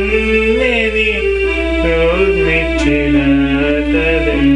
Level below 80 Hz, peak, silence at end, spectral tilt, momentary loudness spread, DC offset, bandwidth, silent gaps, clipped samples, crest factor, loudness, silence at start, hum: -22 dBFS; -2 dBFS; 0 s; -6.5 dB/octave; 3 LU; under 0.1%; 10 kHz; none; under 0.1%; 10 dB; -13 LUFS; 0 s; none